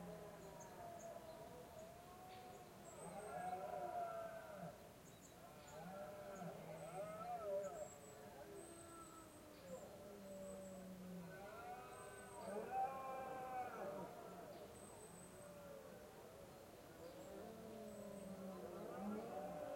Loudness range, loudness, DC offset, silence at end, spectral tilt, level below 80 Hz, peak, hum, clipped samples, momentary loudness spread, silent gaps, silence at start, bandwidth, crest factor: 6 LU; -53 LUFS; under 0.1%; 0 s; -5 dB/octave; -76 dBFS; -34 dBFS; none; under 0.1%; 11 LU; none; 0 s; 16.5 kHz; 18 dB